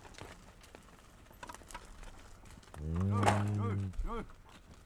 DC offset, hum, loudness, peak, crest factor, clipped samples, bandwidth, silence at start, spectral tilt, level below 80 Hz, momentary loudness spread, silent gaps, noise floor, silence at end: under 0.1%; none; -35 LUFS; -12 dBFS; 26 dB; under 0.1%; 13.5 kHz; 0 s; -6.5 dB/octave; -48 dBFS; 26 LU; none; -58 dBFS; 0 s